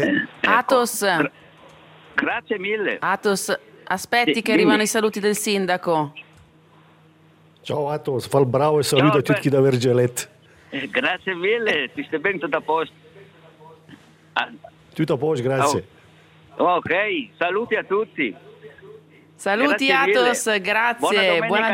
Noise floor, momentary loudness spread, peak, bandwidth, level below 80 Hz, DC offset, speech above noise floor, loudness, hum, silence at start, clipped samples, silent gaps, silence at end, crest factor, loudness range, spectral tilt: -53 dBFS; 10 LU; -2 dBFS; 16 kHz; -66 dBFS; under 0.1%; 33 dB; -20 LUFS; none; 0 s; under 0.1%; none; 0 s; 20 dB; 6 LU; -4.5 dB/octave